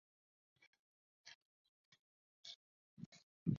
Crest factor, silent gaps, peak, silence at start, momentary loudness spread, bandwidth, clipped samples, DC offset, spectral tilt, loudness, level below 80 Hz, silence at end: 28 dB; 1.35-1.92 s, 2.01-2.43 s, 2.56-2.97 s, 3.06-3.12 s, 3.23-3.46 s; -24 dBFS; 1.25 s; 10 LU; 7.2 kHz; under 0.1%; under 0.1%; -7 dB/octave; -56 LUFS; -78 dBFS; 0 s